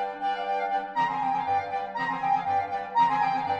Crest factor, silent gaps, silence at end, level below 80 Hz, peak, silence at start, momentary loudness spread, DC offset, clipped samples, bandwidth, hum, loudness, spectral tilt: 14 dB; none; 0 s; -66 dBFS; -12 dBFS; 0 s; 6 LU; under 0.1%; under 0.1%; 8 kHz; none; -27 LUFS; -5 dB/octave